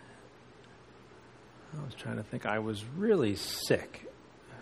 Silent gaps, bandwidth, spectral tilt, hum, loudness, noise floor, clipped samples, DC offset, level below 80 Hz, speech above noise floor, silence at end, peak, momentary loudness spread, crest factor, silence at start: none; 13 kHz; -5 dB/octave; none; -33 LUFS; -56 dBFS; under 0.1%; under 0.1%; -64 dBFS; 23 dB; 0 s; -12 dBFS; 26 LU; 24 dB; 0 s